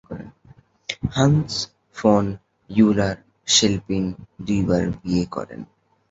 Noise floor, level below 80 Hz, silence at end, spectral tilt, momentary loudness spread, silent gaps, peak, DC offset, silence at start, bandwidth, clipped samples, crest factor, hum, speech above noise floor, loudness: -52 dBFS; -44 dBFS; 0.45 s; -4.5 dB/octave; 19 LU; none; -2 dBFS; under 0.1%; 0.1 s; 8 kHz; under 0.1%; 20 dB; none; 32 dB; -21 LUFS